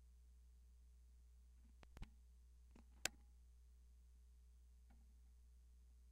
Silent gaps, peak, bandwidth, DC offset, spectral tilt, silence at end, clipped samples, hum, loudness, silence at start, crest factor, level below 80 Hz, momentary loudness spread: none; -18 dBFS; 11 kHz; under 0.1%; -1.5 dB/octave; 0 s; under 0.1%; none; -60 LUFS; 0 s; 42 dB; -66 dBFS; 21 LU